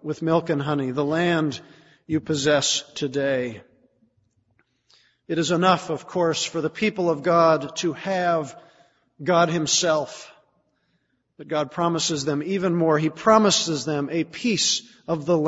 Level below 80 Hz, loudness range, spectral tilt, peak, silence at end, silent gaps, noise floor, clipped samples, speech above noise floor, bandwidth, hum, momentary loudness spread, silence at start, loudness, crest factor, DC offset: -62 dBFS; 4 LU; -4 dB/octave; -2 dBFS; 0 s; none; -70 dBFS; under 0.1%; 48 dB; 8 kHz; none; 10 LU; 0.05 s; -22 LUFS; 22 dB; under 0.1%